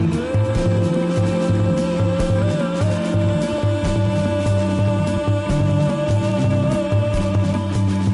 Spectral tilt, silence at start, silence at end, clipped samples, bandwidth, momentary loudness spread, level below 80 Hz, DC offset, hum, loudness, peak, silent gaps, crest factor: -7.5 dB/octave; 0 s; 0 s; under 0.1%; 11.5 kHz; 2 LU; -34 dBFS; under 0.1%; none; -19 LUFS; -8 dBFS; none; 10 dB